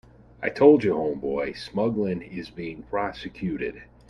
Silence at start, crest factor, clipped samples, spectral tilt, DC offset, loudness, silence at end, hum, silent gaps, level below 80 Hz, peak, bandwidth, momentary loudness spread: 0.4 s; 22 dB; under 0.1%; -8 dB/octave; under 0.1%; -25 LUFS; 0.25 s; none; none; -54 dBFS; -4 dBFS; 10 kHz; 17 LU